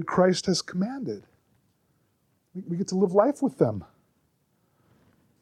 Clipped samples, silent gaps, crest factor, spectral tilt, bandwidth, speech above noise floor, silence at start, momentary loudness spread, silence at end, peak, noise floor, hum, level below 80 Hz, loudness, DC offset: under 0.1%; none; 22 dB; -5.5 dB/octave; 12 kHz; 45 dB; 0 s; 17 LU; 1.6 s; -6 dBFS; -70 dBFS; none; -66 dBFS; -26 LUFS; under 0.1%